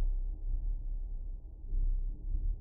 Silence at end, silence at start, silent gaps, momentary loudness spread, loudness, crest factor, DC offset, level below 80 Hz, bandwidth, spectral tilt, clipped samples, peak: 0 s; 0 s; none; 8 LU; -41 LUFS; 10 dB; under 0.1%; -34 dBFS; 0.9 kHz; -13.5 dB/octave; under 0.1%; -24 dBFS